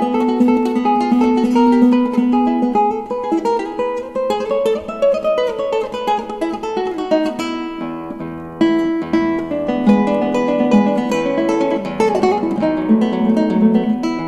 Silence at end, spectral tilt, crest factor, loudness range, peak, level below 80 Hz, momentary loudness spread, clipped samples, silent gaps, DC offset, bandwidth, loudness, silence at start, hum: 0 s; -7 dB/octave; 14 dB; 5 LU; -2 dBFS; -48 dBFS; 8 LU; under 0.1%; none; under 0.1%; 12 kHz; -16 LUFS; 0 s; none